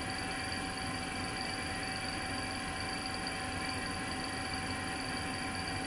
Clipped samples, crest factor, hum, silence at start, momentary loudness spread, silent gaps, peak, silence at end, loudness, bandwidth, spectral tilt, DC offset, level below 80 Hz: under 0.1%; 14 dB; none; 0 s; 1 LU; none; -24 dBFS; 0 s; -37 LUFS; 11.5 kHz; -3 dB/octave; under 0.1%; -54 dBFS